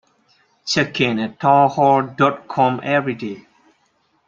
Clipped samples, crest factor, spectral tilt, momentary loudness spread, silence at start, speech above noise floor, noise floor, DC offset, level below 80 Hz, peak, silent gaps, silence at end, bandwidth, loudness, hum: under 0.1%; 18 dB; -5.5 dB/octave; 14 LU; 0.65 s; 46 dB; -63 dBFS; under 0.1%; -62 dBFS; -2 dBFS; none; 0.85 s; 7.6 kHz; -18 LUFS; none